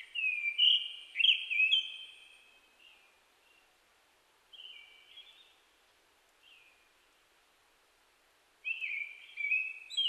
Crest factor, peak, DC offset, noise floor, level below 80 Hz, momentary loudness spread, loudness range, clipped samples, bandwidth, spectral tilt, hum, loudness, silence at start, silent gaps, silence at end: 22 dB; -16 dBFS; under 0.1%; -69 dBFS; -86 dBFS; 27 LU; 26 LU; under 0.1%; 13 kHz; 4 dB/octave; none; -30 LUFS; 0 s; none; 0 s